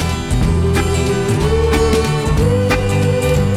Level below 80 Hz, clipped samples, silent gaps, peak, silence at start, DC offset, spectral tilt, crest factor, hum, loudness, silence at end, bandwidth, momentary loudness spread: -22 dBFS; under 0.1%; none; -2 dBFS; 0 s; 0.1%; -6 dB/octave; 14 dB; none; -15 LUFS; 0 s; 15.5 kHz; 2 LU